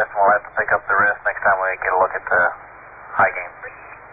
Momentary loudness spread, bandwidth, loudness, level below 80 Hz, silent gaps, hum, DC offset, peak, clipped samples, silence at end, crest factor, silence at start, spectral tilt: 17 LU; 3.8 kHz; -18 LUFS; -54 dBFS; none; none; under 0.1%; -4 dBFS; under 0.1%; 0 s; 16 dB; 0 s; -8.5 dB/octave